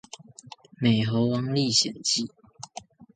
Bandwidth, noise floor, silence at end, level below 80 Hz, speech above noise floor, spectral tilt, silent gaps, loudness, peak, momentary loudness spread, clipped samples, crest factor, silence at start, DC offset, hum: 9.6 kHz; -49 dBFS; 0.1 s; -62 dBFS; 24 dB; -4 dB/octave; none; -24 LUFS; -8 dBFS; 22 LU; under 0.1%; 18 dB; 0.8 s; under 0.1%; none